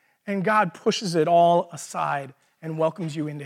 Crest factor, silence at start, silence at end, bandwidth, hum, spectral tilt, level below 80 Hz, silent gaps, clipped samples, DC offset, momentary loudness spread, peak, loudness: 14 dB; 0.25 s; 0 s; 14 kHz; none; -5 dB/octave; -80 dBFS; none; under 0.1%; under 0.1%; 14 LU; -8 dBFS; -23 LUFS